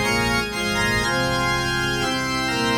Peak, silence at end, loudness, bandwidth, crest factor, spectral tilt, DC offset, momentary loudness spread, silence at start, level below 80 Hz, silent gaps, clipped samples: -8 dBFS; 0 s; -21 LUFS; 19 kHz; 12 dB; -3.5 dB/octave; under 0.1%; 2 LU; 0 s; -38 dBFS; none; under 0.1%